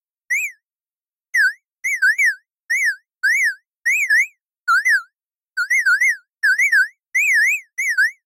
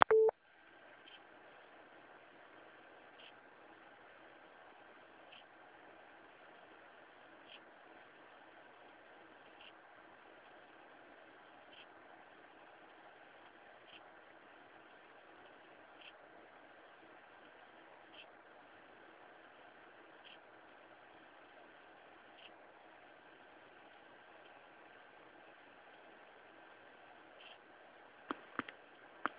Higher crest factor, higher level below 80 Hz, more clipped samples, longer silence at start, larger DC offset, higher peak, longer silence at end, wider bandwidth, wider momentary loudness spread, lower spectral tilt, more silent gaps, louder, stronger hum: second, 12 dB vs 42 dB; about the same, under -90 dBFS vs -86 dBFS; neither; first, 0.3 s vs 0 s; neither; about the same, -8 dBFS vs -6 dBFS; first, 0.15 s vs 0 s; first, 16 kHz vs 4 kHz; first, 9 LU vs 3 LU; second, 7 dB/octave vs -1 dB/octave; neither; first, -17 LUFS vs -51 LUFS; neither